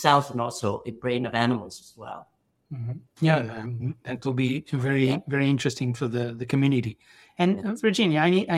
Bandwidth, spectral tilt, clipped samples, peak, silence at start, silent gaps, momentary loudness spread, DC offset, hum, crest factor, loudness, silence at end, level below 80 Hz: 13.5 kHz; -6 dB/octave; under 0.1%; -4 dBFS; 0 s; none; 15 LU; under 0.1%; none; 22 dB; -26 LUFS; 0 s; -64 dBFS